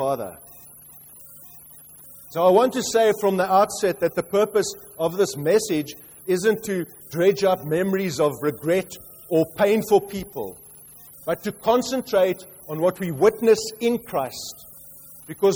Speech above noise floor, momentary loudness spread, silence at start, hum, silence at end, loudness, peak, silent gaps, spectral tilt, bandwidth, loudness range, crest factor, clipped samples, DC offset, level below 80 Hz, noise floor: 24 dB; 23 LU; 0 s; none; 0 s; -22 LUFS; -6 dBFS; none; -5 dB/octave; over 20 kHz; 3 LU; 18 dB; under 0.1%; under 0.1%; -58 dBFS; -46 dBFS